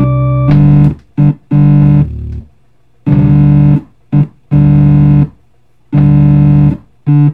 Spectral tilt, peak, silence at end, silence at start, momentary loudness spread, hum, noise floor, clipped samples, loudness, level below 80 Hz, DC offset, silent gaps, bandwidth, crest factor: -12 dB/octave; 0 dBFS; 0 s; 0 s; 10 LU; none; -52 dBFS; under 0.1%; -9 LUFS; -26 dBFS; under 0.1%; none; 3.5 kHz; 8 dB